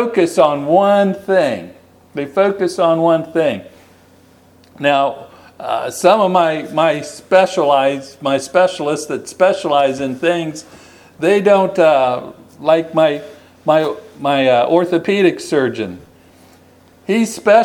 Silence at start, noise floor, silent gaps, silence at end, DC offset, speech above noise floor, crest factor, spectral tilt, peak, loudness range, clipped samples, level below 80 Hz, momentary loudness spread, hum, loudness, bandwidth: 0 s; -47 dBFS; none; 0 s; under 0.1%; 33 dB; 16 dB; -5 dB/octave; 0 dBFS; 3 LU; under 0.1%; -62 dBFS; 12 LU; none; -15 LUFS; 17.5 kHz